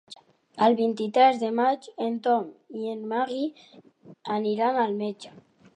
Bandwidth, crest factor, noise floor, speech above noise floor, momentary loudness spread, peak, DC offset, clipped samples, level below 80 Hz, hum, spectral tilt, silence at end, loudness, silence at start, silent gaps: 10 kHz; 20 dB; -51 dBFS; 26 dB; 16 LU; -6 dBFS; under 0.1%; under 0.1%; -82 dBFS; none; -6 dB/octave; 0.45 s; -25 LUFS; 0.1 s; none